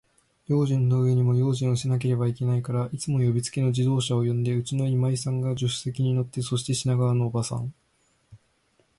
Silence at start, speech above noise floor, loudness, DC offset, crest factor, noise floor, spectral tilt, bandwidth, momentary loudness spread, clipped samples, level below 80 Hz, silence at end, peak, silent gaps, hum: 0.5 s; 44 dB; -25 LUFS; under 0.1%; 12 dB; -67 dBFS; -6.5 dB/octave; 11.5 kHz; 6 LU; under 0.1%; -58 dBFS; 0.6 s; -14 dBFS; none; none